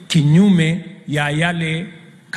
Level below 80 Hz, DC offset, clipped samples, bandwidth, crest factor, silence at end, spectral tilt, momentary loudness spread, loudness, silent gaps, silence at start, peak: -52 dBFS; under 0.1%; under 0.1%; 12 kHz; 14 dB; 0 s; -6 dB/octave; 13 LU; -16 LUFS; none; 0 s; -4 dBFS